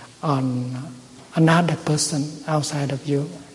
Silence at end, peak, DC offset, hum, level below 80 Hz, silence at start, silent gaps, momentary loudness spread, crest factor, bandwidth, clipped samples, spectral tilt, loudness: 0 s; -6 dBFS; under 0.1%; none; -60 dBFS; 0 s; none; 13 LU; 16 dB; 11.5 kHz; under 0.1%; -5 dB/octave; -22 LUFS